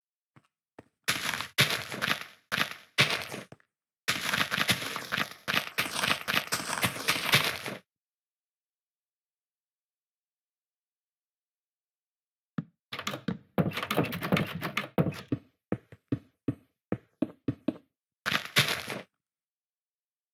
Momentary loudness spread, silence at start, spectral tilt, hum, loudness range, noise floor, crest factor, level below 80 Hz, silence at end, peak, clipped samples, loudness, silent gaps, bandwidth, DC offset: 14 LU; 1.1 s; -3 dB/octave; none; 9 LU; under -90 dBFS; 26 dB; -68 dBFS; 1.3 s; -8 dBFS; under 0.1%; -30 LUFS; 3.98-4.08 s, 7.98-8.96 s, 9.08-9.42 s, 9.51-10.48 s, 10.54-10.71 s, 10.78-12.54 s, 12.82-12.89 s; over 20 kHz; under 0.1%